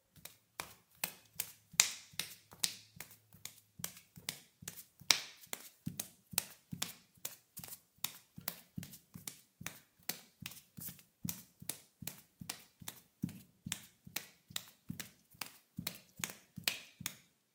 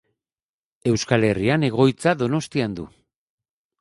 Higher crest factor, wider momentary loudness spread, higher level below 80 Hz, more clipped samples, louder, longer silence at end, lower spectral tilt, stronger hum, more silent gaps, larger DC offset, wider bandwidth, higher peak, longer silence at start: first, 46 dB vs 20 dB; first, 13 LU vs 10 LU; second, -78 dBFS vs -52 dBFS; neither; second, -42 LUFS vs -21 LUFS; second, 0.35 s vs 0.95 s; second, -1 dB/octave vs -6 dB/octave; neither; neither; neither; first, 18 kHz vs 11.5 kHz; first, 0 dBFS vs -4 dBFS; second, 0.15 s vs 0.85 s